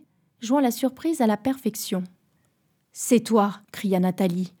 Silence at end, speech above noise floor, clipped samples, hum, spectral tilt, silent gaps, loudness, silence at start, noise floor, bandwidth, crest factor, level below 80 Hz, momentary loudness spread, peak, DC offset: 0.1 s; 45 dB; under 0.1%; none; -5.5 dB/octave; none; -24 LUFS; 0.4 s; -68 dBFS; over 20 kHz; 18 dB; -74 dBFS; 10 LU; -6 dBFS; under 0.1%